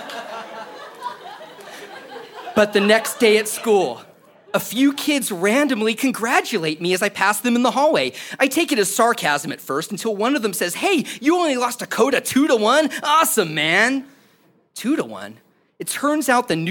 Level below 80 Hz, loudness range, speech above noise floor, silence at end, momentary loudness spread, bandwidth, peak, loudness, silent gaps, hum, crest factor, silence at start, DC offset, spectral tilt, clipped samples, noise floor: -68 dBFS; 3 LU; 39 dB; 0 s; 19 LU; 17.5 kHz; 0 dBFS; -19 LUFS; none; none; 20 dB; 0 s; under 0.1%; -3 dB/octave; under 0.1%; -57 dBFS